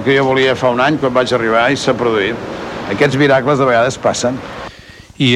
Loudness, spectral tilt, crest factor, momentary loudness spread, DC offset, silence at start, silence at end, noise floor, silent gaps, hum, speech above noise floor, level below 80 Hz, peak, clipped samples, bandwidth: -14 LUFS; -5 dB/octave; 14 dB; 12 LU; under 0.1%; 0 s; 0 s; -38 dBFS; none; none; 24 dB; -46 dBFS; 0 dBFS; under 0.1%; 12 kHz